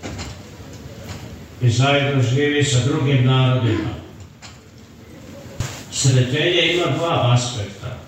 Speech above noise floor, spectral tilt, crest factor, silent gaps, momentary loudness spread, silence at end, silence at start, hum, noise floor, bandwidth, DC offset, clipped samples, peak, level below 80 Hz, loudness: 25 dB; -5 dB/octave; 16 dB; none; 21 LU; 0 s; 0 s; none; -42 dBFS; 9.2 kHz; under 0.1%; under 0.1%; -4 dBFS; -46 dBFS; -18 LUFS